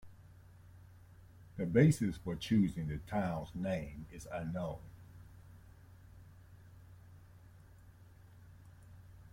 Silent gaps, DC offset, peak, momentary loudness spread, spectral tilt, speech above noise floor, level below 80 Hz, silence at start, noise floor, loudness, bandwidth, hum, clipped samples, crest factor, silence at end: none; under 0.1%; -14 dBFS; 28 LU; -7 dB/octave; 24 dB; -58 dBFS; 0.05 s; -58 dBFS; -35 LUFS; 16.5 kHz; none; under 0.1%; 24 dB; 0.05 s